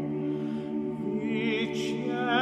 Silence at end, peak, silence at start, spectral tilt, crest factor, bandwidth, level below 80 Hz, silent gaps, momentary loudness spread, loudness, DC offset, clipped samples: 0 s; -14 dBFS; 0 s; -6 dB/octave; 16 dB; 10 kHz; -64 dBFS; none; 4 LU; -30 LUFS; under 0.1%; under 0.1%